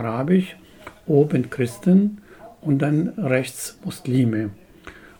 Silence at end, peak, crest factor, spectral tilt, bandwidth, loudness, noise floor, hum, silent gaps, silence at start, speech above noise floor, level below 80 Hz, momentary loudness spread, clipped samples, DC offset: 0.25 s; -4 dBFS; 18 dB; -7 dB/octave; 19.5 kHz; -21 LUFS; -44 dBFS; none; none; 0 s; 24 dB; -58 dBFS; 14 LU; under 0.1%; under 0.1%